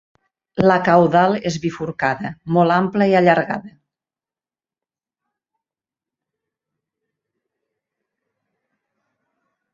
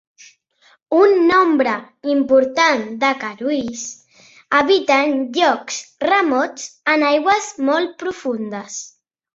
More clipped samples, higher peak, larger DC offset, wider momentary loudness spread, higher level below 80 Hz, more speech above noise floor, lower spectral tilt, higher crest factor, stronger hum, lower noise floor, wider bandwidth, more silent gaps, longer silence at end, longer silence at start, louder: neither; about the same, -2 dBFS vs -2 dBFS; neither; about the same, 12 LU vs 13 LU; about the same, -58 dBFS vs -62 dBFS; first, over 74 dB vs 39 dB; first, -7 dB/octave vs -2.5 dB/octave; about the same, 20 dB vs 16 dB; neither; first, under -90 dBFS vs -56 dBFS; about the same, 7.6 kHz vs 8 kHz; neither; first, 6.05 s vs 0.5 s; second, 0.55 s vs 0.9 s; about the same, -17 LUFS vs -17 LUFS